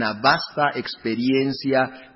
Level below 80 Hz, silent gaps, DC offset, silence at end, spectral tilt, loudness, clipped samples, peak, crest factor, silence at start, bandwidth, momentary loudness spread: -60 dBFS; none; under 0.1%; 0.1 s; -8.5 dB/octave; -22 LUFS; under 0.1%; -2 dBFS; 20 dB; 0 s; 5.8 kHz; 6 LU